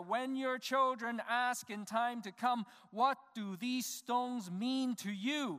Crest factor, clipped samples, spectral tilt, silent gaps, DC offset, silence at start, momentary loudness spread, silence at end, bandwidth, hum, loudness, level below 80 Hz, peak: 18 dB; under 0.1%; -3.5 dB/octave; none; under 0.1%; 0 s; 6 LU; 0 s; 15.5 kHz; none; -37 LUFS; under -90 dBFS; -20 dBFS